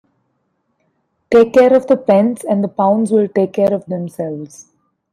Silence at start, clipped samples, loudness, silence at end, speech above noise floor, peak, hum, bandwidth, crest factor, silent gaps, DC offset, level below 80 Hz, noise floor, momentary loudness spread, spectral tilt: 1.3 s; under 0.1%; -14 LUFS; 0.5 s; 53 dB; -2 dBFS; none; 13.5 kHz; 14 dB; none; under 0.1%; -58 dBFS; -67 dBFS; 14 LU; -7 dB/octave